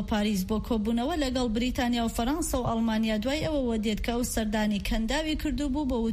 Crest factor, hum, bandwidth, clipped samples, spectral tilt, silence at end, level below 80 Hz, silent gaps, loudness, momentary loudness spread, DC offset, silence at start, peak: 12 dB; none; 15.5 kHz; under 0.1%; -5 dB/octave; 0 s; -38 dBFS; none; -28 LUFS; 2 LU; under 0.1%; 0 s; -14 dBFS